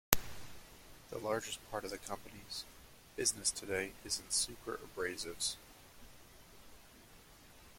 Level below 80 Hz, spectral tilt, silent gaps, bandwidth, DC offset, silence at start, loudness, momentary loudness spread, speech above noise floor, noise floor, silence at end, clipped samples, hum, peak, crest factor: -58 dBFS; -1.5 dB/octave; none; 16.5 kHz; under 0.1%; 0.1 s; -39 LUFS; 24 LU; 19 dB; -59 dBFS; 0 s; under 0.1%; none; -2 dBFS; 38 dB